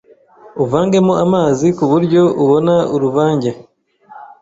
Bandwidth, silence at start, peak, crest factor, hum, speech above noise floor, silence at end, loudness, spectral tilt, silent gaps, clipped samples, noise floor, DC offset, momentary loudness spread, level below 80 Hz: 8 kHz; 0.45 s; -2 dBFS; 12 dB; none; 31 dB; 0.15 s; -13 LUFS; -7.5 dB/octave; none; under 0.1%; -43 dBFS; under 0.1%; 8 LU; -52 dBFS